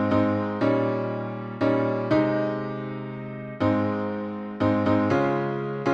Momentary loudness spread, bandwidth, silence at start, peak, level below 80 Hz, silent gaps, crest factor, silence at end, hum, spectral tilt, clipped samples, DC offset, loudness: 11 LU; 7.4 kHz; 0 s; -10 dBFS; -58 dBFS; none; 14 dB; 0 s; none; -8.5 dB/octave; under 0.1%; under 0.1%; -25 LUFS